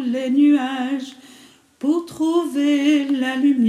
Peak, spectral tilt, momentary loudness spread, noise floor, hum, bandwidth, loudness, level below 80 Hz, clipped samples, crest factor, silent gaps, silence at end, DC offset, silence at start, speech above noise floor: -6 dBFS; -4.5 dB/octave; 10 LU; -48 dBFS; none; 12.5 kHz; -19 LUFS; -72 dBFS; under 0.1%; 12 dB; none; 0 s; under 0.1%; 0 s; 30 dB